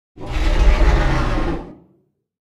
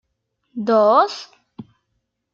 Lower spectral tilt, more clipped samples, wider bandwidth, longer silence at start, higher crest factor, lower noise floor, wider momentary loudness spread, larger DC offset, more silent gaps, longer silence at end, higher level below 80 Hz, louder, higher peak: about the same, -6.5 dB/octave vs -5.5 dB/octave; neither; first, 8.2 kHz vs 7.4 kHz; second, 0.15 s vs 0.55 s; about the same, 16 dB vs 18 dB; second, -61 dBFS vs -73 dBFS; second, 13 LU vs 20 LU; neither; neither; first, 0.85 s vs 0.7 s; first, -18 dBFS vs -74 dBFS; second, -20 LUFS vs -17 LUFS; about the same, -2 dBFS vs -4 dBFS